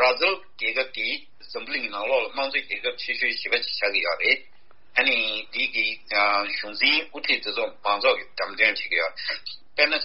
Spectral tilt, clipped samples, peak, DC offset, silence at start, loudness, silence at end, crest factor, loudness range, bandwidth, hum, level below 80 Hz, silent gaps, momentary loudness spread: 3 dB/octave; under 0.1%; -4 dBFS; 0.8%; 0 s; -23 LUFS; 0 s; 22 dB; 3 LU; 6 kHz; none; -68 dBFS; none; 8 LU